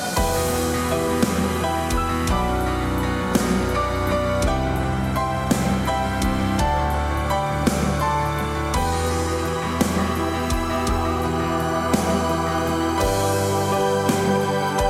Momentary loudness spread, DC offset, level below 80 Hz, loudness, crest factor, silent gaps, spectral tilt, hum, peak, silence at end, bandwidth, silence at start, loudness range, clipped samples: 3 LU; under 0.1%; -30 dBFS; -22 LUFS; 18 dB; none; -5 dB/octave; none; -4 dBFS; 0 s; 16.5 kHz; 0 s; 1 LU; under 0.1%